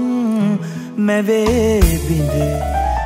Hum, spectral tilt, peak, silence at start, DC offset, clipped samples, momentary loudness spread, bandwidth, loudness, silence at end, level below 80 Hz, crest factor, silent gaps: none; -6.5 dB/octave; 0 dBFS; 0 s; under 0.1%; under 0.1%; 5 LU; 16 kHz; -17 LUFS; 0 s; -24 dBFS; 16 dB; none